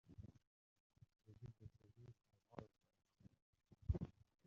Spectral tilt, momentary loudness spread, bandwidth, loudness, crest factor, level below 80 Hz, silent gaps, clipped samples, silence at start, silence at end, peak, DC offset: -10 dB/octave; 19 LU; 7 kHz; -53 LUFS; 28 dB; -62 dBFS; 0.47-0.90 s, 3.42-3.53 s; under 0.1%; 0.1 s; 0.35 s; -28 dBFS; under 0.1%